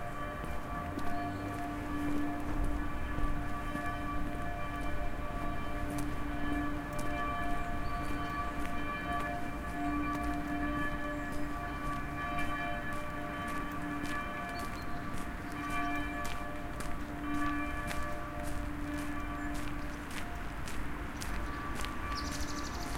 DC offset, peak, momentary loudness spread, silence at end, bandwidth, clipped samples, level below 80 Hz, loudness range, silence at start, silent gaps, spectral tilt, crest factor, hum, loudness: under 0.1%; -16 dBFS; 5 LU; 0 s; 16.5 kHz; under 0.1%; -42 dBFS; 3 LU; 0 s; none; -5.5 dB/octave; 20 dB; none; -38 LUFS